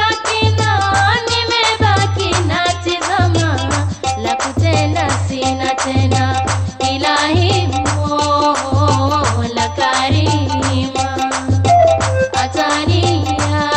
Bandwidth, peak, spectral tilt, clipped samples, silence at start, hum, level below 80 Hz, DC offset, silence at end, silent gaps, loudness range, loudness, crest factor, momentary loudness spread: 9 kHz; -2 dBFS; -4.5 dB/octave; under 0.1%; 0 s; none; -36 dBFS; 0.1%; 0 s; none; 2 LU; -15 LUFS; 12 dB; 5 LU